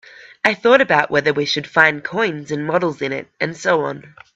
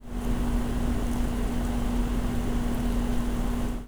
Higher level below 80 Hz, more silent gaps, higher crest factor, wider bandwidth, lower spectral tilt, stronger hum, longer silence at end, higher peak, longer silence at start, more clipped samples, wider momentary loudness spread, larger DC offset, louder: second, -60 dBFS vs -30 dBFS; neither; first, 18 dB vs 12 dB; second, 8.2 kHz vs over 20 kHz; second, -4.5 dB/octave vs -6.5 dB/octave; neither; first, 0.3 s vs 0 s; first, 0 dBFS vs -14 dBFS; first, 0.2 s vs 0 s; neither; first, 11 LU vs 1 LU; neither; first, -17 LUFS vs -30 LUFS